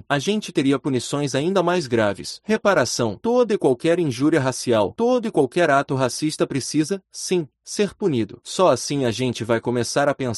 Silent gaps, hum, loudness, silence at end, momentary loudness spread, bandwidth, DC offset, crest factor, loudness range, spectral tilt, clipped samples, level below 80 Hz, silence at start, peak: none; none; -21 LUFS; 0 s; 6 LU; 12 kHz; under 0.1%; 18 dB; 3 LU; -5 dB/octave; under 0.1%; -58 dBFS; 0.1 s; -4 dBFS